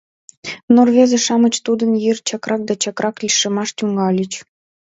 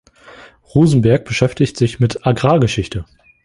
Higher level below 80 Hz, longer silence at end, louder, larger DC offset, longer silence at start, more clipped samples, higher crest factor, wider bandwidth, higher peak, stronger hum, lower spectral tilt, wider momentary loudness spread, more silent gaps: second, -64 dBFS vs -40 dBFS; about the same, 0.5 s vs 0.4 s; about the same, -16 LUFS vs -15 LUFS; neither; about the same, 0.45 s vs 0.4 s; neither; about the same, 16 dB vs 16 dB; second, 8 kHz vs 11.5 kHz; about the same, 0 dBFS vs 0 dBFS; neither; second, -4 dB/octave vs -7 dB/octave; first, 13 LU vs 8 LU; first, 0.63-0.68 s vs none